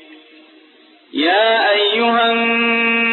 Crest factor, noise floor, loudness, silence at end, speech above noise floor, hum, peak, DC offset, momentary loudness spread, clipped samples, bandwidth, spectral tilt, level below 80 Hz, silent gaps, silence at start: 12 dB; -48 dBFS; -14 LUFS; 0 s; 34 dB; none; -4 dBFS; under 0.1%; 3 LU; under 0.1%; 4.4 kHz; -5.5 dB/octave; -70 dBFS; none; 0.1 s